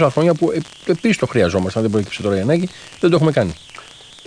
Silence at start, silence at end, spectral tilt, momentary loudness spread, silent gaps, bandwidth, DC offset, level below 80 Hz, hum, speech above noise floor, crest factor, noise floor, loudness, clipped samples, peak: 0 s; 0.45 s; -6.5 dB/octave; 13 LU; none; 10.5 kHz; under 0.1%; -48 dBFS; none; 23 dB; 16 dB; -40 dBFS; -18 LUFS; under 0.1%; -2 dBFS